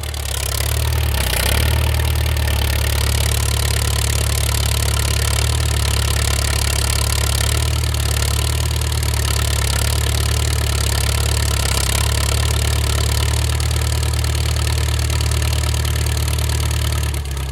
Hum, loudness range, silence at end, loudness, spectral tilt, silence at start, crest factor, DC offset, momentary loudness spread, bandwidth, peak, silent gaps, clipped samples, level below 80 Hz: none; 1 LU; 0 s; -18 LUFS; -3.5 dB/octave; 0 s; 16 dB; under 0.1%; 2 LU; 17 kHz; -2 dBFS; none; under 0.1%; -20 dBFS